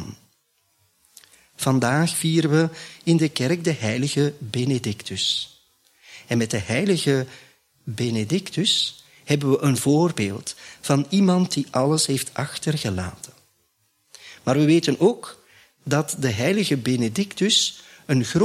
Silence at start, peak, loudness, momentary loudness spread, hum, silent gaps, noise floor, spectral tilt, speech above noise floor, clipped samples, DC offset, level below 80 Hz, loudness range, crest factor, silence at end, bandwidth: 0 s; -6 dBFS; -22 LUFS; 14 LU; none; none; -67 dBFS; -5 dB/octave; 46 dB; under 0.1%; under 0.1%; -60 dBFS; 3 LU; 18 dB; 0 s; 15 kHz